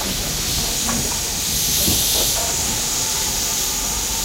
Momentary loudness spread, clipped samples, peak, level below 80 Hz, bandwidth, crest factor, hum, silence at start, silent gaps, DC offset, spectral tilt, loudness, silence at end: 5 LU; under 0.1%; -6 dBFS; -34 dBFS; 16 kHz; 16 dB; none; 0 s; none; under 0.1%; -1 dB/octave; -18 LUFS; 0 s